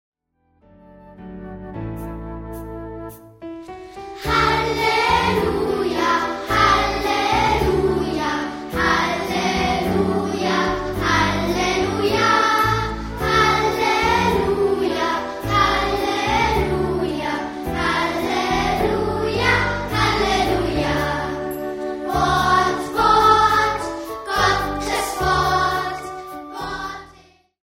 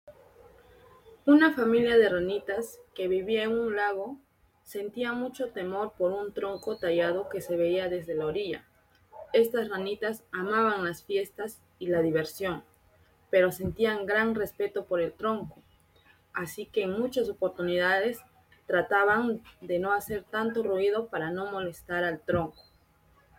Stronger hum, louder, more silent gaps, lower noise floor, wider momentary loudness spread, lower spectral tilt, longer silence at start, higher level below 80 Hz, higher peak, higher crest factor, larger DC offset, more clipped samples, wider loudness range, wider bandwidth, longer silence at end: neither; first, -19 LUFS vs -29 LUFS; neither; about the same, -64 dBFS vs -63 dBFS; first, 16 LU vs 12 LU; about the same, -4.5 dB/octave vs -5.5 dB/octave; first, 1 s vs 0.05 s; first, -36 dBFS vs -62 dBFS; first, -2 dBFS vs -10 dBFS; about the same, 18 dB vs 20 dB; neither; neither; about the same, 4 LU vs 5 LU; about the same, 16.5 kHz vs 17 kHz; second, 0.55 s vs 0.9 s